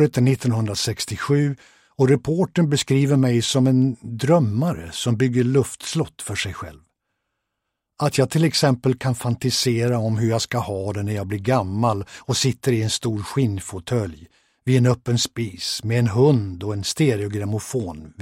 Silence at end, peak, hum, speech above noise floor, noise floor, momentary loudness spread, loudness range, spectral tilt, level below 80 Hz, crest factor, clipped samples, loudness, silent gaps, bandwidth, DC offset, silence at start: 0 s; -4 dBFS; none; 59 dB; -80 dBFS; 8 LU; 4 LU; -5.5 dB/octave; -52 dBFS; 16 dB; under 0.1%; -21 LUFS; none; 16 kHz; under 0.1%; 0 s